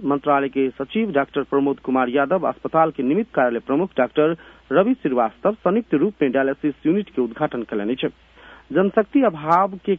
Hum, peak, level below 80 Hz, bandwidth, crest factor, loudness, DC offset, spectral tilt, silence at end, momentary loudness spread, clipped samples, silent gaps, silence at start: none; -4 dBFS; -58 dBFS; 4.3 kHz; 18 dB; -21 LUFS; under 0.1%; -9 dB/octave; 0 s; 6 LU; under 0.1%; none; 0 s